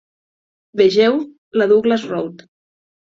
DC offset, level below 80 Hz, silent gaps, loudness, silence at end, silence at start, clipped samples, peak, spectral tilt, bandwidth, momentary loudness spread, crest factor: under 0.1%; -62 dBFS; 1.38-1.51 s; -16 LUFS; 0.8 s; 0.75 s; under 0.1%; -2 dBFS; -6 dB/octave; 7.6 kHz; 13 LU; 16 dB